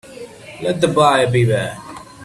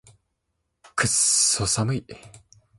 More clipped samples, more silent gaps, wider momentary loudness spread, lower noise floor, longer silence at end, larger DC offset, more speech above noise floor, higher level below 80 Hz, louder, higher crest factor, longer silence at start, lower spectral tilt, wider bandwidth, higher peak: neither; neither; first, 22 LU vs 13 LU; second, -36 dBFS vs -77 dBFS; second, 0 s vs 0.4 s; neither; second, 21 dB vs 54 dB; about the same, -50 dBFS vs -52 dBFS; first, -16 LUFS vs -21 LUFS; about the same, 18 dB vs 20 dB; second, 0.05 s vs 0.95 s; first, -5.5 dB/octave vs -2 dB/octave; about the same, 12.5 kHz vs 12 kHz; first, 0 dBFS vs -6 dBFS